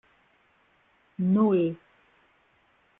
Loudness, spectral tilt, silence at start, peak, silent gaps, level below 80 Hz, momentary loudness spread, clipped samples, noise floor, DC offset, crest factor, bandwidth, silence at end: -25 LUFS; -12 dB/octave; 1.2 s; -12 dBFS; none; -72 dBFS; 22 LU; under 0.1%; -65 dBFS; under 0.1%; 18 dB; 3.8 kHz; 1.25 s